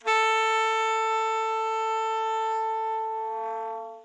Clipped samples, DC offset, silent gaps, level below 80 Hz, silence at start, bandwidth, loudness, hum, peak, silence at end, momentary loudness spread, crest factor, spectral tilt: under 0.1%; under 0.1%; none; -82 dBFS; 0.05 s; 11 kHz; -26 LUFS; none; -12 dBFS; 0 s; 9 LU; 14 dB; 2.5 dB/octave